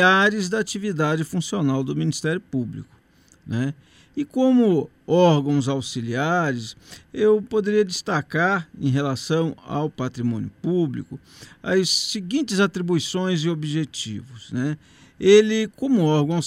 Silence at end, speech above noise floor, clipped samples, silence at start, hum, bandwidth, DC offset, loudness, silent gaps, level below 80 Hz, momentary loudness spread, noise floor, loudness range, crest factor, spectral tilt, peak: 0 s; 34 dB; under 0.1%; 0 s; none; 15 kHz; under 0.1%; -22 LUFS; none; -60 dBFS; 13 LU; -56 dBFS; 4 LU; 20 dB; -5.5 dB/octave; -2 dBFS